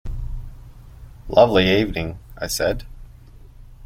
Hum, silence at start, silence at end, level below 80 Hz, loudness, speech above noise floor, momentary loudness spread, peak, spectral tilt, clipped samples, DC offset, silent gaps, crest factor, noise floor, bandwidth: none; 0.05 s; 0 s; -34 dBFS; -19 LUFS; 25 dB; 19 LU; -2 dBFS; -5 dB/octave; under 0.1%; under 0.1%; none; 20 dB; -43 dBFS; 16.5 kHz